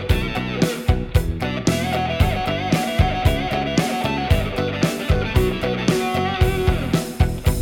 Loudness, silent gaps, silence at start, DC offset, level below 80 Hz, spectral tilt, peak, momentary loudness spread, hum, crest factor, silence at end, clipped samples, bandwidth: -21 LUFS; none; 0 s; under 0.1%; -26 dBFS; -6 dB/octave; -2 dBFS; 3 LU; none; 16 dB; 0 s; under 0.1%; 18.5 kHz